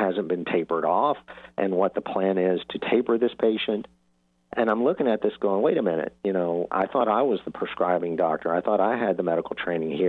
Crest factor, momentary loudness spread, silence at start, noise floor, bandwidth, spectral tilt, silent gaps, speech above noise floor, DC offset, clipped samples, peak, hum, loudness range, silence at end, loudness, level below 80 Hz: 16 dB; 5 LU; 0 s; -67 dBFS; 4.4 kHz; -8.5 dB/octave; none; 43 dB; under 0.1%; under 0.1%; -10 dBFS; none; 1 LU; 0 s; -25 LUFS; -66 dBFS